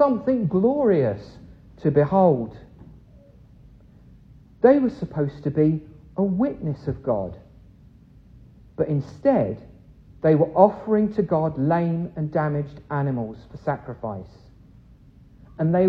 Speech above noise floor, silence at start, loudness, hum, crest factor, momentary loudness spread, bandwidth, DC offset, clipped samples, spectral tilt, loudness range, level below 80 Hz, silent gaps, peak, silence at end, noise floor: 29 dB; 0 s; -22 LUFS; none; 22 dB; 14 LU; 6 kHz; under 0.1%; under 0.1%; -11 dB/octave; 6 LU; -50 dBFS; none; -2 dBFS; 0 s; -50 dBFS